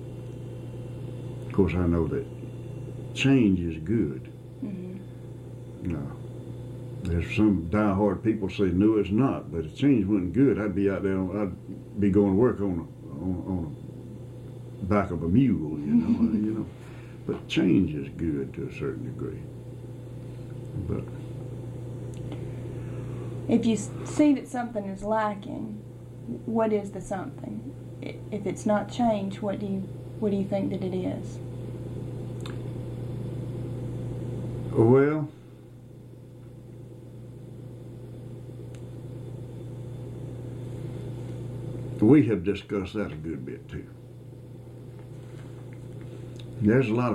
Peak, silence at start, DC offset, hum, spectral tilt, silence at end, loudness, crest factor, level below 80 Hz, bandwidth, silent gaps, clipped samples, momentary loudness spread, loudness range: -8 dBFS; 0 s; under 0.1%; none; -8 dB/octave; 0 s; -28 LUFS; 20 dB; -52 dBFS; 12 kHz; none; under 0.1%; 19 LU; 13 LU